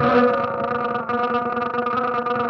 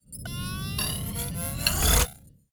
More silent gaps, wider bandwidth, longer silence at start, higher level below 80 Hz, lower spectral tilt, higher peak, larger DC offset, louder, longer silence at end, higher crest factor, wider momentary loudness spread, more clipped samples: neither; second, 6.2 kHz vs over 20 kHz; about the same, 0 s vs 0.1 s; second, -56 dBFS vs -34 dBFS; first, -7.5 dB/octave vs -3 dB/octave; second, -6 dBFS vs -2 dBFS; neither; first, -21 LUFS vs -26 LUFS; second, 0 s vs 0.25 s; second, 16 dB vs 26 dB; second, 6 LU vs 12 LU; neither